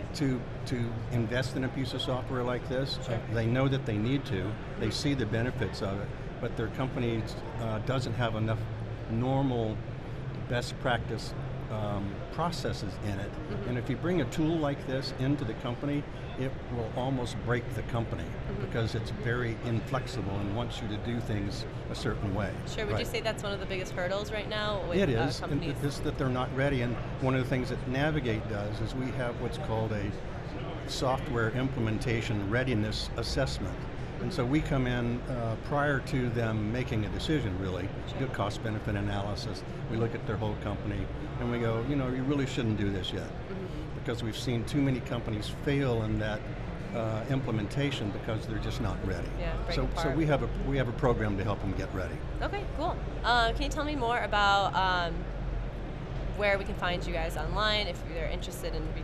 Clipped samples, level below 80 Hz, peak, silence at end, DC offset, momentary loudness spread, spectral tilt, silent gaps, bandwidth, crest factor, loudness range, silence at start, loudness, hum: under 0.1%; -42 dBFS; -12 dBFS; 0 s; under 0.1%; 8 LU; -6.5 dB/octave; none; 13.5 kHz; 18 dB; 3 LU; 0 s; -32 LUFS; none